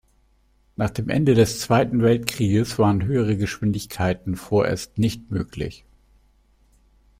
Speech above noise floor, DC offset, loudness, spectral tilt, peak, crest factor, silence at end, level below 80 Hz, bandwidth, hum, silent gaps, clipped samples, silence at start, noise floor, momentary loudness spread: 40 dB; under 0.1%; -22 LUFS; -6.5 dB/octave; 0 dBFS; 22 dB; 1.45 s; -46 dBFS; 16 kHz; none; none; under 0.1%; 0.8 s; -61 dBFS; 10 LU